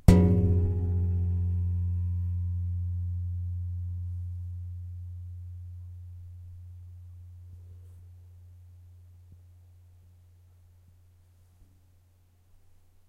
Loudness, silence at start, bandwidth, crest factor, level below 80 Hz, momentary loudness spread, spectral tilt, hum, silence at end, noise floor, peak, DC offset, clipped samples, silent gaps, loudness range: -30 LUFS; 0.1 s; 10.5 kHz; 28 dB; -40 dBFS; 24 LU; -9 dB/octave; none; 3.75 s; -62 dBFS; -4 dBFS; under 0.1%; under 0.1%; none; 24 LU